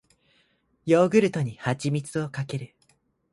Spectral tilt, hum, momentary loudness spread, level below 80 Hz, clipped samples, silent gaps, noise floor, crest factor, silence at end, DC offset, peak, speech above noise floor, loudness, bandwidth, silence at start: -6.5 dB/octave; none; 16 LU; -64 dBFS; under 0.1%; none; -67 dBFS; 20 dB; 0.65 s; under 0.1%; -6 dBFS; 43 dB; -25 LUFS; 11.5 kHz; 0.85 s